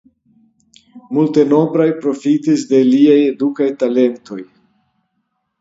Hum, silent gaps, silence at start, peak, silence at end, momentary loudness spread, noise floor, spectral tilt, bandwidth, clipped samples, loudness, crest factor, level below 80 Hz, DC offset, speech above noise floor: none; none; 0.95 s; 0 dBFS; 1.15 s; 10 LU; -69 dBFS; -7 dB/octave; 7.8 kHz; under 0.1%; -14 LUFS; 14 dB; -66 dBFS; under 0.1%; 56 dB